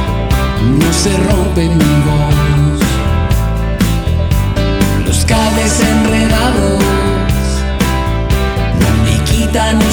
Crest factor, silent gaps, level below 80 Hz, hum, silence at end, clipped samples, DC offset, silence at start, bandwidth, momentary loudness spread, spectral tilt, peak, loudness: 10 dB; none; -16 dBFS; none; 0 s; under 0.1%; under 0.1%; 0 s; over 20 kHz; 4 LU; -5.5 dB/octave; 0 dBFS; -12 LUFS